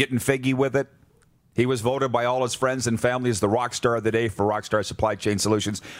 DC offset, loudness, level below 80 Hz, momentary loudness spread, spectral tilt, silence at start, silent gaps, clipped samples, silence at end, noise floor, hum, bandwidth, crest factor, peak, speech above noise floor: under 0.1%; -24 LUFS; -52 dBFS; 3 LU; -5 dB/octave; 0 s; none; under 0.1%; 0 s; -60 dBFS; none; 16 kHz; 18 dB; -6 dBFS; 37 dB